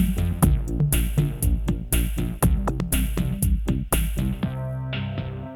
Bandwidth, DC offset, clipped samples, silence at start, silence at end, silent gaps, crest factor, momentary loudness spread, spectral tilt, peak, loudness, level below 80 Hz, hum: 17.5 kHz; under 0.1%; under 0.1%; 0 s; 0 s; none; 18 dB; 7 LU; -5.5 dB/octave; -4 dBFS; -25 LUFS; -26 dBFS; none